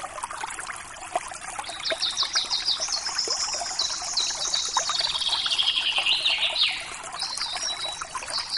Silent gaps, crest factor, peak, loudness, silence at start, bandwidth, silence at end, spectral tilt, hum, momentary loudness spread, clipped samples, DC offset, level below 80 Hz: none; 18 dB; -10 dBFS; -25 LUFS; 0 s; 11.5 kHz; 0 s; 1.5 dB/octave; none; 12 LU; under 0.1%; under 0.1%; -58 dBFS